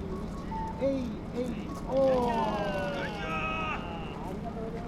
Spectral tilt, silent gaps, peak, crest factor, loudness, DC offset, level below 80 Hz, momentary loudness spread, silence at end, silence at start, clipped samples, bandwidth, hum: -6.5 dB/octave; none; -16 dBFS; 16 dB; -32 LUFS; under 0.1%; -44 dBFS; 11 LU; 0 s; 0 s; under 0.1%; 14 kHz; none